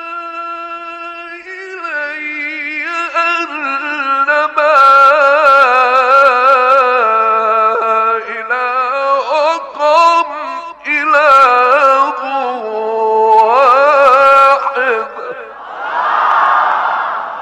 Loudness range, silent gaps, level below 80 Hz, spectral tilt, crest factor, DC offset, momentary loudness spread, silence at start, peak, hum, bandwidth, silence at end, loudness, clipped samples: 8 LU; none; -60 dBFS; -2 dB/octave; 12 dB; under 0.1%; 16 LU; 0 s; 0 dBFS; none; 10.5 kHz; 0 s; -10 LUFS; under 0.1%